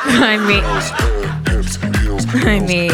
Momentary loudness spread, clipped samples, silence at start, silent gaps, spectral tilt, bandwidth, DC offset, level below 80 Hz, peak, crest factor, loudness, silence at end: 7 LU; under 0.1%; 0 s; none; -5 dB/octave; 18 kHz; under 0.1%; -22 dBFS; -2 dBFS; 12 dB; -15 LUFS; 0 s